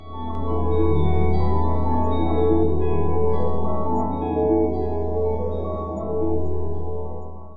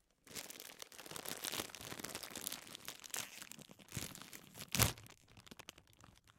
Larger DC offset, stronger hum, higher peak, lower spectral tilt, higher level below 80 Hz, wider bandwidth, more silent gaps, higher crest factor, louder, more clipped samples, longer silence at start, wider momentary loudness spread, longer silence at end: first, 8% vs under 0.1%; neither; first, -6 dBFS vs -10 dBFS; first, -11 dB/octave vs -2.5 dB/octave; first, -36 dBFS vs -62 dBFS; second, 4.9 kHz vs 17 kHz; neither; second, 12 dB vs 36 dB; first, -23 LUFS vs -43 LUFS; neither; second, 0 s vs 0.25 s; second, 9 LU vs 21 LU; about the same, 0 s vs 0.05 s